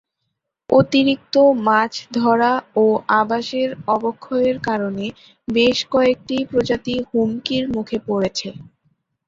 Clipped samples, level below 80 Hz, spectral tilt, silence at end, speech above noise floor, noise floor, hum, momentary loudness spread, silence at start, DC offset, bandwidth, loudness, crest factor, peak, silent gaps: under 0.1%; -54 dBFS; -5.5 dB/octave; 0.65 s; 58 dB; -76 dBFS; none; 8 LU; 0.7 s; under 0.1%; 7.8 kHz; -18 LUFS; 16 dB; -2 dBFS; none